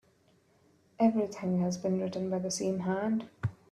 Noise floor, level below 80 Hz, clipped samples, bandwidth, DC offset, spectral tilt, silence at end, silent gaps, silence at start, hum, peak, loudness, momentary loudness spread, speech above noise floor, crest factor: -67 dBFS; -66 dBFS; under 0.1%; 12.5 kHz; under 0.1%; -6 dB/octave; 0.15 s; none; 1 s; none; -14 dBFS; -32 LUFS; 6 LU; 36 dB; 18 dB